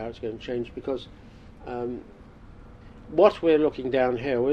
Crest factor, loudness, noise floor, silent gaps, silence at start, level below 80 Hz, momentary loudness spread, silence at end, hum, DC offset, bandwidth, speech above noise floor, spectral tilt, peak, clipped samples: 22 dB; -25 LUFS; -46 dBFS; none; 0 s; -50 dBFS; 17 LU; 0 s; none; under 0.1%; 8.4 kHz; 22 dB; -7.5 dB/octave; -4 dBFS; under 0.1%